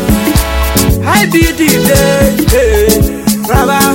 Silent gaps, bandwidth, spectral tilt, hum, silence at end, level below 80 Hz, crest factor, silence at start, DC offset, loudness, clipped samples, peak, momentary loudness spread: none; 17.5 kHz; -4.5 dB/octave; none; 0 s; -16 dBFS; 8 dB; 0 s; under 0.1%; -9 LUFS; 0.2%; 0 dBFS; 4 LU